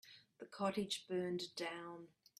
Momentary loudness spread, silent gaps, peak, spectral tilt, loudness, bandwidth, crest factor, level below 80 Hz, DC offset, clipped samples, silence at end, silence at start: 16 LU; none; -26 dBFS; -4.5 dB/octave; -43 LUFS; 14.5 kHz; 20 dB; -84 dBFS; under 0.1%; under 0.1%; 0.3 s; 0.05 s